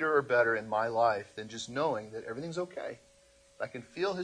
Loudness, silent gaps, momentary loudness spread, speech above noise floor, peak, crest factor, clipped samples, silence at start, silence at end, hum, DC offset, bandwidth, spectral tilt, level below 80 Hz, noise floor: -32 LUFS; none; 14 LU; 31 dB; -14 dBFS; 18 dB; under 0.1%; 0 s; 0 s; none; under 0.1%; 10.5 kHz; -4.5 dB/octave; -72 dBFS; -63 dBFS